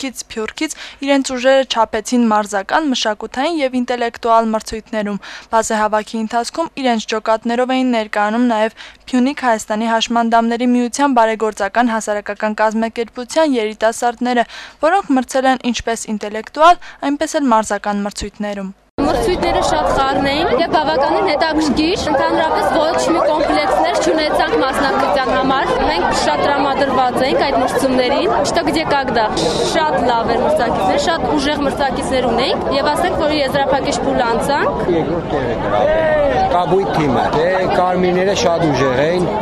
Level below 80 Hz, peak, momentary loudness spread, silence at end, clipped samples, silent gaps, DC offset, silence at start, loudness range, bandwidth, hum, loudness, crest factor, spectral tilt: -38 dBFS; -2 dBFS; 6 LU; 0 s; under 0.1%; 18.90-18.98 s; under 0.1%; 0 s; 3 LU; 13.5 kHz; none; -16 LUFS; 14 dB; -4.5 dB/octave